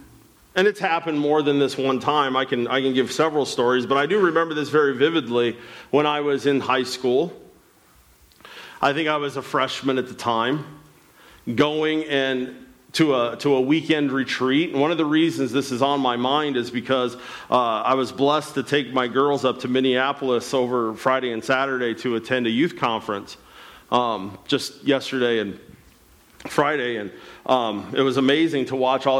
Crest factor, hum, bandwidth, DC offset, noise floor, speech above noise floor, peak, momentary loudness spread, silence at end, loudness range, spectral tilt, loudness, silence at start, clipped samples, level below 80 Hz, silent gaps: 16 dB; none; 15.5 kHz; under 0.1%; -55 dBFS; 33 dB; -6 dBFS; 7 LU; 0 s; 4 LU; -5 dB/octave; -22 LUFS; 0 s; under 0.1%; -64 dBFS; none